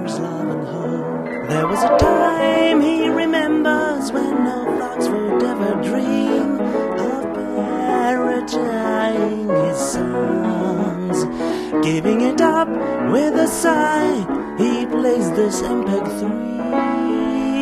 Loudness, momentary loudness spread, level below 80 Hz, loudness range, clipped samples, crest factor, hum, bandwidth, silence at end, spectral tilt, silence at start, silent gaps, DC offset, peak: -19 LUFS; 7 LU; -44 dBFS; 3 LU; under 0.1%; 16 dB; none; 13 kHz; 0 s; -5.5 dB/octave; 0 s; none; under 0.1%; -2 dBFS